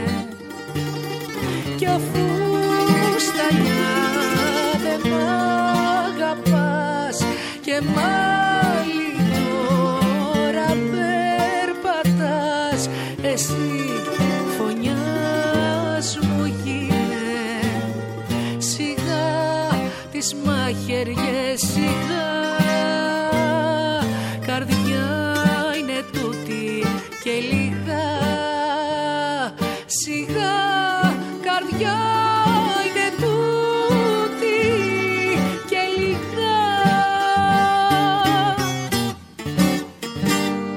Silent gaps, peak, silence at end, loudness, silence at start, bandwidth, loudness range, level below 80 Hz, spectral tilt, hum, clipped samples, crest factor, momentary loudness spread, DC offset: none; -4 dBFS; 0 s; -20 LUFS; 0 s; 17 kHz; 4 LU; -50 dBFS; -4.5 dB/octave; none; under 0.1%; 16 dB; 7 LU; under 0.1%